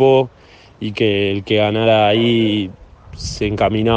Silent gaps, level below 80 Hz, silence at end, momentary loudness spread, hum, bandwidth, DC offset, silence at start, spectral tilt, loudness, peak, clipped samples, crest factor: none; -40 dBFS; 0 s; 14 LU; none; 9 kHz; under 0.1%; 0 s; -6 dB/octave; -16 LUFS; 0 dBFS; under 0.1%; 16 dB